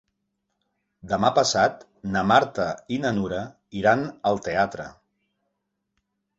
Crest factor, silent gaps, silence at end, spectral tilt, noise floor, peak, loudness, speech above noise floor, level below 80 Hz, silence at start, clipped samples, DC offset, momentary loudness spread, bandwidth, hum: 22 dB; none; 1.45 s; -4.5 dB/octave; -78 dBFS; -4 dBFS; -23 LUFS; 55 dB; -56 dBFS; 1.05 s; under 0.1%; under 0.1%; 13 LU; 8.2 kHz; none